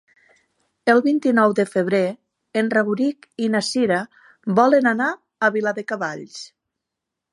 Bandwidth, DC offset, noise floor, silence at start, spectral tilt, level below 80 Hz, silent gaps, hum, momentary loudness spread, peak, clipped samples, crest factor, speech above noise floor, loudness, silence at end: 11.5 kHz; under 0.1%; -83 dBFS; 0.85 s; -5.5 dB/octave; -72 dBFS; none; none; 12 LU; -2 dBFS; under 0.1%; 18 dB; 64 dB; -20 LUFS; 0.85 s